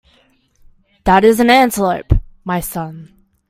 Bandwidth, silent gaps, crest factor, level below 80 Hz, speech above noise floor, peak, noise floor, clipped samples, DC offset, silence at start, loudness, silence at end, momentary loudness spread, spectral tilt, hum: 16.5 kHz; none; 16 dB; -28 dBFS; 42 dB; 0 dBFS; -55 dBFS; under 0.1%; under 0.1%; 1.05 s; -14 LUFS; 0.45 s; 14 LU; -5.5 dB/octave; none